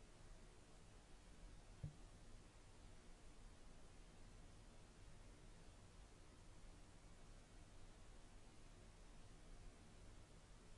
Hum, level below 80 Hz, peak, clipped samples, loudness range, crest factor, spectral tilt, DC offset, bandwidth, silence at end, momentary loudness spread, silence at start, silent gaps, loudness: none; -64 dBFS; -40 dBFS; under 0.1%; 2 LU; 22 dB; -4.5 dB/octave; under 0.1%; 11 kHz; 0 s; 2 LU; 0 s; none; -66 LUFS